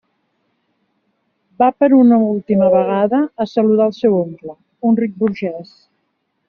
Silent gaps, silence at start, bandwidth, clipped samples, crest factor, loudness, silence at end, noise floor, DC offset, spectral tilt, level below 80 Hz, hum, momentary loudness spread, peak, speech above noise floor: none; 1.6 s; 6.2 kHz; under 0.1%; 14 dB; -15 LUFS; 0.85 s; -69 dBFS; under 0.1%; -7.5 dB/octave; -60 dBFS; none; 14 LU; -2 dBFS; 54 dB